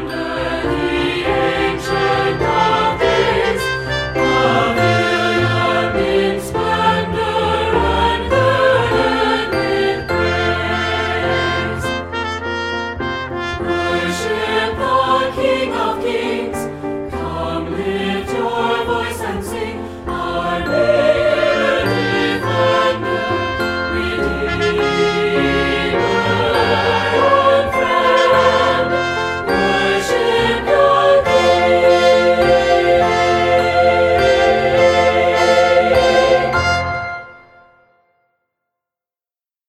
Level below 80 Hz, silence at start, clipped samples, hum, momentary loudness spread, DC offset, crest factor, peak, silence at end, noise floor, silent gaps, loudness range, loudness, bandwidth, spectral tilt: -36 dBFS; 0 s; under 0.1%; none; 9 LU; under 0.1%; 14 dB; 0 dBFS; 2.3 s; under -90 dBFS; none; 7 LU; -15 LUFS; 14.5 kHz; -5 dB/octave